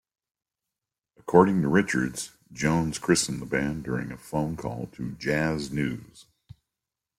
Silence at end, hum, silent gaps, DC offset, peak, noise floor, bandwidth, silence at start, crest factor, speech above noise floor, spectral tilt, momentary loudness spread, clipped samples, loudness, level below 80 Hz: 0.95 s; none; none; under 0.1%; -4 dBFS; -88 dBFS; 15.5 kHz; 1.25 s; 24 dB; 62 dB; -5 dB/octave; 14 LU; under 0.1%; -26 LUFS; -52 dBFS